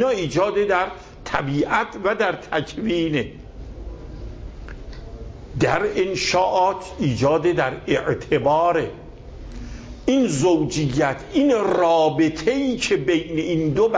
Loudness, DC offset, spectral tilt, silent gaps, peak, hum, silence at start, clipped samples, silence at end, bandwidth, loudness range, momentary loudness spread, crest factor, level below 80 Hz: -21 LUFS; under 0.1%; -5.5 dB/octave; none; -4 dBFS; none; 0 s; under 0.1%; 0 s; 8 kHz; 7 LU; 20 LU; 16 dB; -40 dBFS